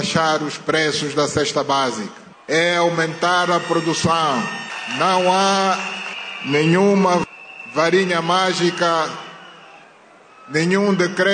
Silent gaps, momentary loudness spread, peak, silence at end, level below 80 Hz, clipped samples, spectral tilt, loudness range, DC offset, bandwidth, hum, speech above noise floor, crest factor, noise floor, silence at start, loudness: none; 11 LU; -4 dBFS; 0 s; -58 dBFS; under 0.1%; -4 dB/octave; 2 LU; under 0.1%; 9.6 kHz; none; 29 dB; 14 dB; -47 dBFS; 0 s; -18 LUFS